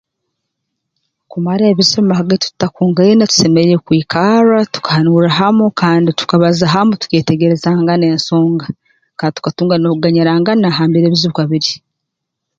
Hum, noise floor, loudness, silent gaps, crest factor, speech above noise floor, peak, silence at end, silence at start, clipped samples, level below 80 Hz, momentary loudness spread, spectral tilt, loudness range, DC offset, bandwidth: none; -76 dBFS; -12 LUFS; none; 12 dB; 65 dB; 0 dBFS; 0.8 s; 1.3 s; under 0.1%; -52 dBFS; 8 LU; -5.5 dB/octave; 3 LU; under 0.1%; 7.6 kHz